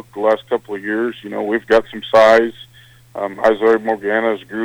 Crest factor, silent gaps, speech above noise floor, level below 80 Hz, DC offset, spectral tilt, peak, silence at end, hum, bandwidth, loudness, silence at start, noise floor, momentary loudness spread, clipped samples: 14 dB; none; 28 dB; -54 dBFS; under 0.1%; -5 dB/octave; -2 dBFS; 0 s; none; 16 kHz; -16 LUFS; 0.15 s; -44 dBFS; 13 LU; under 0.1%